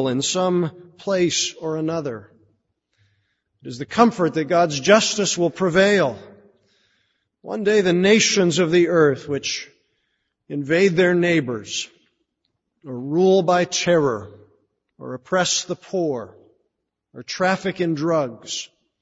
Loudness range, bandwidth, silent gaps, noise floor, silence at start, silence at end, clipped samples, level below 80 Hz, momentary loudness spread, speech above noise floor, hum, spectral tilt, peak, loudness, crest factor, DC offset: 6 LU; 8 kHz; none; -76 dBFS; 0 s; 0.35 s; under 0.1%; -60 dBFS; 16 LU; 57 dB; none; -4 dB/octave; 0 dBFS; -19 LUFS; 20 dB; under 0.1%